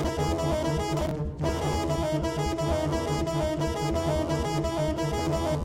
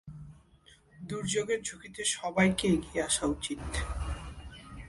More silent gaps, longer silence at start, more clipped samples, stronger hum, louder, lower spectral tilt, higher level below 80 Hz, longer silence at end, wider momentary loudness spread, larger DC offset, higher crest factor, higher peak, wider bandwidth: neither; about the same, 0 s vs 0.05 s; neither; neither; first, -28 LUFS vs -31 LUFS; first, -6 dB/octave vs -4 dB/octave; first, -36 dBFS vs -44 dBFS; about the same, 0 s vs 0 s; second, 2 LU vs 20 LU; neither; second, 12 dB vs 22 dB; about the same, -14 dBFS vs -12 dBFS; first, 16 kHz vs 11.5 kHz